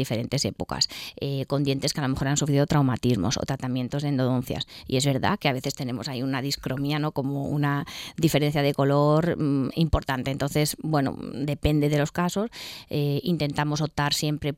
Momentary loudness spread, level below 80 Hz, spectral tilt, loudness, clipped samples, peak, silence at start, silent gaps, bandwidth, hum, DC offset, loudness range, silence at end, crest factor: 8 LU; -44 dBFS; -5.5 dB/octave; -25 LUFS; under 0.1%; -8 dBFS; 0 s; none; 16.5 kHz; none; under 0.1%; 3 LU; 0 s; 18 dB